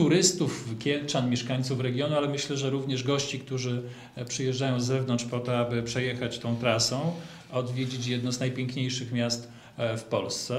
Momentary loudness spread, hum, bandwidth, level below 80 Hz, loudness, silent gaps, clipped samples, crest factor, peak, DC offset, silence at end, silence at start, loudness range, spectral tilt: 8 LU; none; 13.5 kHz; -62 dBFS; -29 LUFS; none; under 0.1%; 22 dB; -6 dBFS; under 0.1%; 0 s; 0 s; 2 LU; -4.5 dB/octave